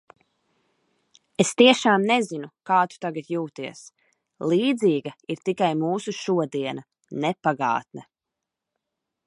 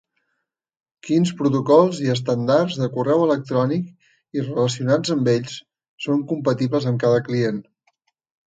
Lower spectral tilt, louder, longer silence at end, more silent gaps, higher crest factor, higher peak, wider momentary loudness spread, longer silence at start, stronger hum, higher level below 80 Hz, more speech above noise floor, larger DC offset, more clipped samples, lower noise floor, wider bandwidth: second, -4.5 dB/octave vs -6.5 dB/octave; second, -23 LUFS vs -20 LUFS; first, 1.25 s vs 0.85 s; second, none vs 5.89-5.98 s; first, 24 dB vs 18 dB; about the same, -2 dBFS vs -2 dBFS; first, 18 LU vs 13 LU; first, 1.4 s vs 1.05 s; neither; second, -74 dBFS vs -64 dBFS; first, 63 dB vs 58 dB; neither; neither; first, -86 dBFS vs -78 dBFS; first, 11.5 kHz vs 9.2 kHz